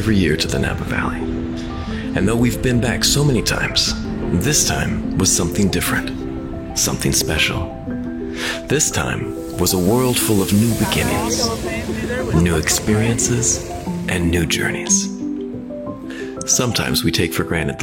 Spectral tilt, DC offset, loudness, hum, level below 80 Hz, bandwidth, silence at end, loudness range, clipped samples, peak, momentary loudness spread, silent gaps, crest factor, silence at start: -3.5 dB/octave; under 0.1%; -18 LUFS; none; -32 dBFS; 17 kHz; 0 s; 3 LU; under 0.1%; -2 dBFS; 10 LU; none; 16 dB; 0 s